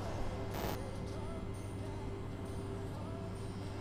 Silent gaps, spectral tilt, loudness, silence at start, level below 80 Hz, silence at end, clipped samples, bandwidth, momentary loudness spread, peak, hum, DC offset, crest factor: none; -6.5 dB/octave; -43 LUFS; 0 s; -48 dBFS; 0 s; under 0.1%; 16 kHz; 4 LU; -24 dBFS; none; under 0.1%; 16 dB